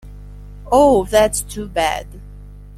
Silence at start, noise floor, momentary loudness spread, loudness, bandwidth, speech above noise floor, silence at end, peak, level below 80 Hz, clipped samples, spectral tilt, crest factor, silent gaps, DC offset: 0.05 s; -36 dBFS; 13 LU; -16 LUFS; 16 kHz; 21 dB; 0 s; -2 dBFS; -34 dBFS; under 0.1%; -4 dB/octave; 16 dB; none; under 0.1%